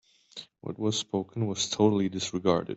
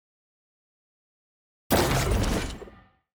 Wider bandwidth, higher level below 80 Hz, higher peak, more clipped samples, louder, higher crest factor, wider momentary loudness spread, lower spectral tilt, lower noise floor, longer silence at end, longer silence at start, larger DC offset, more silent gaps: second, 8.2 kHz vs over 20 kHz; second, -66 dBFS vs -36 dBFS; about the same, -10 dBFS vs -10 dBFS; neither; second, -28 LUFS vs -25 LUFS; about the same, 20 dB vs 20 dB; first, 19 LU vs 13 LU; about the same, -5 dB/octave vs -4.5 dB/octave; about the same, -49 dBFS vs -51 dBFS; second, 0 s vs 0.45 s; second, 0.35 s vs 1.7 s; neither; neither